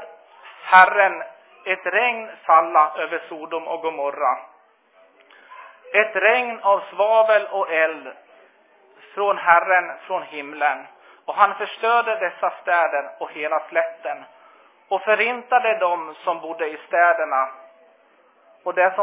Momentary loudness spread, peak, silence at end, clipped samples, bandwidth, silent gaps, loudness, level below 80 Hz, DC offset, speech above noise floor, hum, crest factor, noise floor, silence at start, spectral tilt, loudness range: 14 LU; 0 dBFS; 0 s; under 0.1%; 4 kHz; none; -20 LUFS; -76 dBFS; under 0.1%; 37 dB; none; 22 dB; -57 dBFS; 0 s; -6 dB/octave; 4 LU